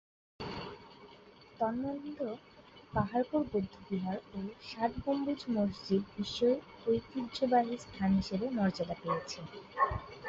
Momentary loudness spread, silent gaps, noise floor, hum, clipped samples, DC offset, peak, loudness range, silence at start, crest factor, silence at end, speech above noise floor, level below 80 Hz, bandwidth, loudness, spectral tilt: 12 LU; none; -57 dBFS; none; under 0.1%; under 0.1%; -16 dBFS; 4 LU; 0.4 s; 18 dB; 0 s; 23 dB; -56 dBFS; 7.8 kHz; -35 LUFS; -6.5 dB/octave